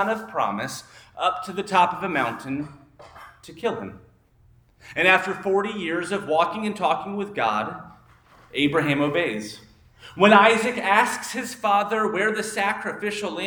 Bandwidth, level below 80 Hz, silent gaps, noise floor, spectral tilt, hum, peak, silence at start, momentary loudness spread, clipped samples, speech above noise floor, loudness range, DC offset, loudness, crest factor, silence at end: over 20 kHz; -62 dBFS; none; -57 dBFS; -4 dB/octave; none; 0 dBFS; 0 s; 15 LU; under 0.1%; 34 dB; 6 LU; under 0.1%; -22 LUFS; 22 dB; 0 s